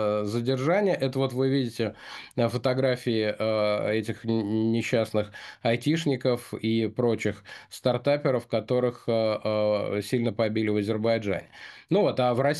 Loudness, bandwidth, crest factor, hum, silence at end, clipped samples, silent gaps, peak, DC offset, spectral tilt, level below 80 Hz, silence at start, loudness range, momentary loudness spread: -26 LUFS; 12.5 kHz; 16 dB; none; 0 s; under 0.1%; none; -10 dBFS; under 0.1%; -6.5 dB/octave; -66 dBFS; 0 s; 1 LU; 6 LU